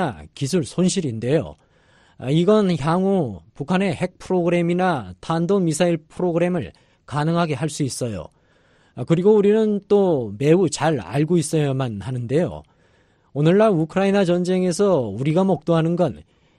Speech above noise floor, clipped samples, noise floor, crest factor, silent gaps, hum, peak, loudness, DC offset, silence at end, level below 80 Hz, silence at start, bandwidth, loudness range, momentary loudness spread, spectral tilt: 39 dB; under 0.1%; -58 dBFS; 16 dB; none; none; -4 dBFS; -20 LUFS; under 0.1%; 0.4 s; -52 dBFS; 0 s; 13 kHz; 3 LU; 11 LU; -6.5 dB/octave